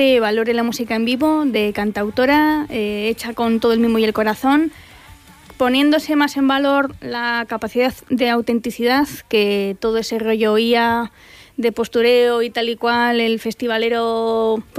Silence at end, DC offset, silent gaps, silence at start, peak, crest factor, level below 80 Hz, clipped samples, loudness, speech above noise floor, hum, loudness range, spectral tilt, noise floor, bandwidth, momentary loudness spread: 0 s; under 0.1%; none; 0 s; -4 dBFS; 14 dB; -50 dBFS; under 0.1%; -18 LUFS; 26 dB; none; 1 LU; -4.5 dB/octave; -43 dBFS; 15.5 kHz; 7 LU